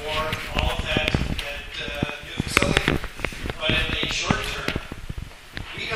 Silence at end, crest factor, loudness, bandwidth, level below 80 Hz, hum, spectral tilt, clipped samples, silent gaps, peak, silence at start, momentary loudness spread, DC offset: 0 s; 26 dB; -25 LUFS; 16 kHz; -34 dBFS; none; -4 dB/octave; under 0.1%; none; 0 dBFS; 0 s; 14 LU; under 0.1%